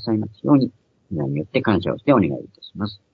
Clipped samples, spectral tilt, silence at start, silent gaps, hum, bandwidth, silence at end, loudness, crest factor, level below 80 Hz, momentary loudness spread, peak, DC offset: under 0.1%; -10 dB/octave; 0 s; none; none; 5 kHz; 0.2 s; -21 LUFS; 18 dB; -56 dBFS; 13 LU; -2 dBFS; under 0.1%